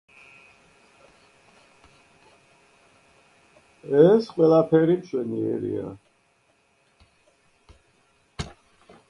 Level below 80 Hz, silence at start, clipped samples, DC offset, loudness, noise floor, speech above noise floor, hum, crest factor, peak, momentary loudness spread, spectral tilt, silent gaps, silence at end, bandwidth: -58 dBFS; 3.85 s; under 0.1%; under 0.1%; -21 LUFS; -65 dBFS; 45 dB; none; 22 dB; -4 dBFS; 21 LU; -8 dB/octave; none; 0.6 s; 10.5 kHz